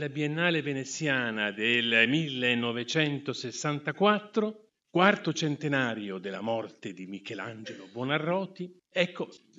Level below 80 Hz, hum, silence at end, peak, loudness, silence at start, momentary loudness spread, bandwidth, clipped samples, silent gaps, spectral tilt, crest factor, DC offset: -80 dBFS; none; 0.2 s; -6 dBFS; -28 LUFS; 0 s; 15 LU; 8 kHz; under 0.1%; none; -4.5 dB/octave; 24 dB; under 0.1%